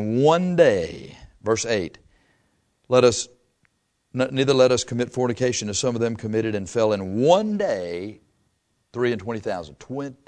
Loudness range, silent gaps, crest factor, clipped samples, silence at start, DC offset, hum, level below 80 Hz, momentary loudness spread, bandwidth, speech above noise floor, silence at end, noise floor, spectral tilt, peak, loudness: 3 LU; none; 20 dB; under 0.1%; 0 s; under 0.1%; none; -56 dBFS; 15 LU; 9.8 kHz; 48 dB; 0.15 s; -69 dBFS; -5 dB/octave; -2 dBFS; -22 LUFS